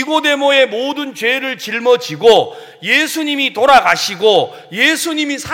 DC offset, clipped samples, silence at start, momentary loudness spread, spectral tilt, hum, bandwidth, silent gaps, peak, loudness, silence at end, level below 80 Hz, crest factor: under 0.1%; under 0.1%; 0 s; 10 LU; -2.5 dB/octave; none; 17 kHz; none; 0 dBFS; -13 LUFS; 0 s; -54 dBFS; 14 dB